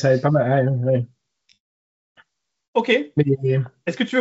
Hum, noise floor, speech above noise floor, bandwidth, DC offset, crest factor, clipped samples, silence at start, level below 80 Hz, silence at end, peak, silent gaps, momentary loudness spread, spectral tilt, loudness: none; -59 dBFS; 40 dB; 7.8 kHz; under 0.1%; 18 dB; under 0.1%; 0 s; -66 dBFS; 0 s; -4 dBFS; 1.60-2.15 s, 2.68-2.73 s; 7 LU; -6 dB/octave; -20 LUFS